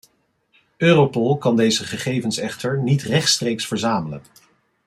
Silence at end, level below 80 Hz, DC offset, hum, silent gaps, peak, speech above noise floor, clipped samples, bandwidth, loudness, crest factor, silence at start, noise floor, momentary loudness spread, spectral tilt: 0.65 s; -60 dBFS; under 0.1%; none; none; -2 dBFS; 45 dB; under 0.1%; 14.5 kHz; -19 LUFS; 18 dB; 0.8 s; -64 dBFS; 9 LU; -4.5 dB/octave